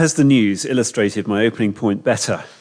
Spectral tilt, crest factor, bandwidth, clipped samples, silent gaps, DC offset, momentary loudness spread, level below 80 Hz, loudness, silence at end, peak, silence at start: -5 dB/octave; 14 dB; 10.5 kHz; under 0.1%; none; under 0.1%; 6 LU; -60 dBFS; -18 LUFS; 0.15 s; -2 dBFS; 0 s